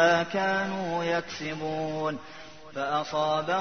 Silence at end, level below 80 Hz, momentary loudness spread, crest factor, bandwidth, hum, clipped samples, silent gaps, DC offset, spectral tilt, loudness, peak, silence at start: 0 s; -64 dBFS; 13 LU; 20 dB; 6.6 kHz; none; under 0.1%; none; 0.3%; -4.5 dB/octave; -29 LUFS; -8 dBFS; 0 s